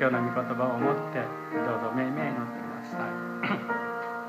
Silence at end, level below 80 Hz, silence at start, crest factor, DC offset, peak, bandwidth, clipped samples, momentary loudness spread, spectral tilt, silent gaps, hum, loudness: 0 s; -78 dBFS; 0 s; 18 dB; under 0.1%; -12 dBFS; 15.5 kHz; under 0.1%; 7 LU; -7.5 dB/octave; none; none; -30 LUFS